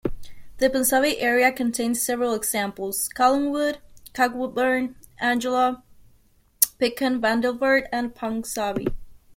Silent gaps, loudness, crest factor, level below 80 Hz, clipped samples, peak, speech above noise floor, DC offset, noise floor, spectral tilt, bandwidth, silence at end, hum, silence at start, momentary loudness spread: none; -23 LUFS; 24 dB; -46 dBFS; under 0.1%; 0 dBFS; 36 dB; under 0.1%; -58 dBFS; -2.5 dB/octave; 16.5 kHz; 0.2 s; none; 0.05 s; 9 LU